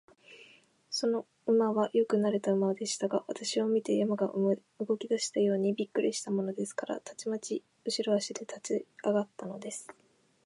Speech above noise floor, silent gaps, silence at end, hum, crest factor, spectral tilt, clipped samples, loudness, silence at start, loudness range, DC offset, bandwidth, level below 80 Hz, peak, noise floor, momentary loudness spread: 30 dB; none; 0.55 s; none; 16 dB; -4.5 dB/octave; under 0.1%; -32 LUFS; 0.3 s; 5 LU; under 0.1%; 11.5 kHz; -86 dBFS; -16 dBFS; -61 dBFS; 10 LU